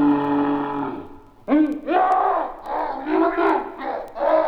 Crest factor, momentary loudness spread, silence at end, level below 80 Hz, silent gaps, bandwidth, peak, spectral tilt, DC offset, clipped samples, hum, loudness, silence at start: 14 dB; 10 LU; 0 s; -50 dBFS; none; 5.4 kHz; -6 dBFS; -7.5 dB/octave; under 0.1%; under 0.1%; none; -22 LUFS; 0 s